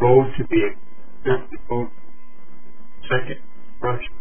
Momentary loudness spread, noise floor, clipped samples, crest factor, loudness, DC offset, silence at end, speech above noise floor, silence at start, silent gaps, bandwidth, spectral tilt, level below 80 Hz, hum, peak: 16 LU; -46 dBFS; under 0.1%; 20 dB; -23 LUFS; 8%; 0 s; 26 dB; 0 s; none; 3.5 kHz; -11 dB/octave; -42 dBFS; none; -2 dBFS